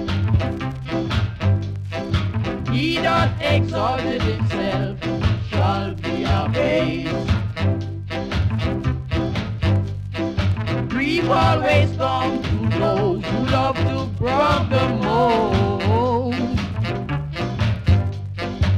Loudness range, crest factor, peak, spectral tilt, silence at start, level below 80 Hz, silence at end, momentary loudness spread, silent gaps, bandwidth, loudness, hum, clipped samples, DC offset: 3 LU; 16 dB; -4 dBFS; -7 dB/octave; 0 s; -34 dBFS; 0 s; 7 LU; none; 9.2 kHz; -21 LUFS; none; under 0.1%; under 0.1%